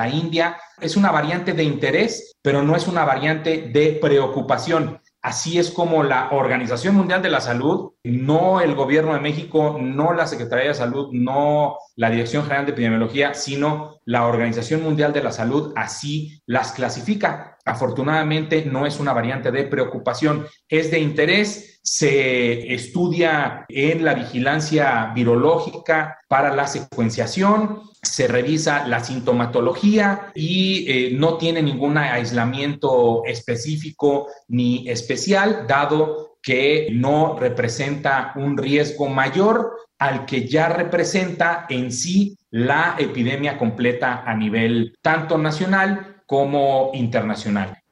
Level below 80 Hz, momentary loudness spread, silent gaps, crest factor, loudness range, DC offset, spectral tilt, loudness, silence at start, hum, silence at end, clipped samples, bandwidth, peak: -60 dBFS; 6 LU; none; 16 dB; 2 LU; under 0.1%; -5 dB/octave; -20 LUFS; 0 s; none; 0.2 s; under 0.1%; 11.5 kHz; -2 dBFS